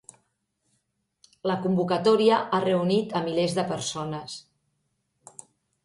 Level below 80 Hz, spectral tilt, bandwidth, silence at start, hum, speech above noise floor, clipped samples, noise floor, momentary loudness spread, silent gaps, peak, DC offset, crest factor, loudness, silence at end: -68 dBFS; -5.5 dB/octave; 11.5 kHz; 1.45 s; none; 51 dB; under 0.1%; -75 dBFS; 20 LU; none; -8 dBFS; under 0.1%; 20 dB; -25 LUFS; 1.45 s